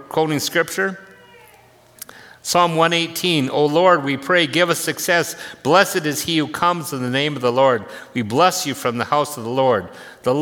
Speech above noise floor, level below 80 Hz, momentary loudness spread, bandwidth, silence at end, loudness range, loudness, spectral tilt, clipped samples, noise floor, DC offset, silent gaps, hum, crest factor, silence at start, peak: 31 dB; -62 dBFS; 11 LU; 18.5 kHz; 0 s; 3 LU; -18 LUFS; -4 dB/octave; under 0.1%; -50 dBFS; under 0.1%; none; none; 18 dB; 0 s; 0 dBFS